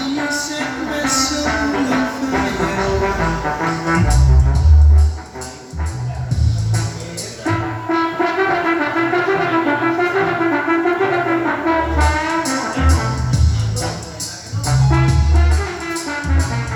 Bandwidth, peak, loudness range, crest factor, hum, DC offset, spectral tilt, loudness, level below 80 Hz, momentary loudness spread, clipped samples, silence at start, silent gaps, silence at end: 13.5 kHz; -2 dBFS; 3 LU; 14 dB; none; under 0.1%; -5.5 dB/octave; -17 LUFS; -22 dBFS; 10 LU; under 0.1%; 0 s; none; 0 s